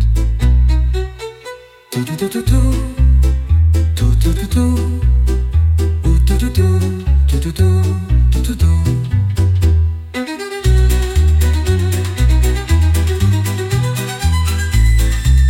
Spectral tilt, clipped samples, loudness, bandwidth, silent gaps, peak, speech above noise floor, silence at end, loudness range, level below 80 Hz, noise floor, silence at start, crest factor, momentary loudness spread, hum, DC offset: -6.5 dB/octave; under 0.1%; -15 LUFS; 16.5 kHz; none; -2 dBFS; 20 dB; 0 s; 1 LU; -16 dBFS; -34 dBFS; 0 s; 10 dB; 6 LU; none; 0.1%